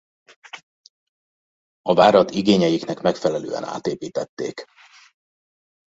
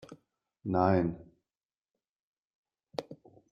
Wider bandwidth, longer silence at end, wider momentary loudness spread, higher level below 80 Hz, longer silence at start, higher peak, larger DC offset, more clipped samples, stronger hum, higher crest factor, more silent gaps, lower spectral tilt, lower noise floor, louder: second, 8 kHz vs 9 kHz; first, 1.2 s vs 0.4 s; first, 25 LU vs 20 LU; about the same, -62 dBFS vs -66 dBFS; first, 0.55 s vs 0.1 s; first, -2 dBFS vs -12 dBFS; neither; neither; neither; about the same, 20 dB vs 24 dB; first, 0.63-1.84 s, 4.29-4.37 s vs 1.65-1.69 s, 2.09-2.34 s, 2.45-2.64 s; second, -5.5 dB/octave vs -8.5 dB/octave; about the same, under -90 dBFS vs under -90 dBFS; first, -20 LUFS vs -31 LUFS